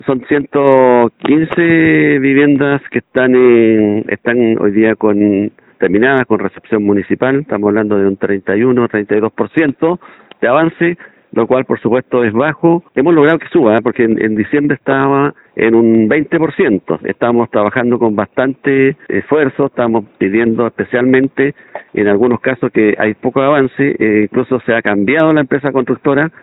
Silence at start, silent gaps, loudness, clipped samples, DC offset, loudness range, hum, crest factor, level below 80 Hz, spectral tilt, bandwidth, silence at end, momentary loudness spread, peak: 0.05 s; none; -12 LUFS; under 0.1%; under 0.1%; 3 LU; none; 12 dB; -52 dBFS; -10.5 dB/octave; 4.1 kHz; 0.15 s; 6 LU; 0 dBFS